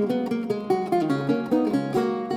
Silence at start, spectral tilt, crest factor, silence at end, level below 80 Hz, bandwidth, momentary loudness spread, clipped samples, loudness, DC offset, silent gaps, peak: 0 s; -7.5 dB/octave; 14 dB; 0 s; -62 dBFS; 16 kHz; 3 LU; under 0.1%; -24 LUFS; under 0.1%; none; -10 dBFS